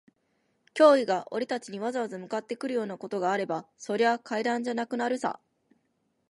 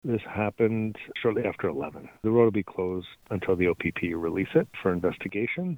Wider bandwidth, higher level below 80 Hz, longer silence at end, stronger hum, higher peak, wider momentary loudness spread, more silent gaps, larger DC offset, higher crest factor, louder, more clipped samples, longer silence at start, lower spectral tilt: second, 11.5 kHz vs 17 kHz; second, -82 dBFS vs -56 dBFS; first, 0.95 s vs 0 s; neither; about the same, -6 dBFS vs -8 dBFS; first, 13 LU vs 9 LU; neither; neither; about the same, 22 dB vs 18 dB; about the same, -28 LUFS vs -28 LUFS; neither; first, 0.75 s vs 0.05 s; second, -4.5 dB/octave vs -8.5 dB/octave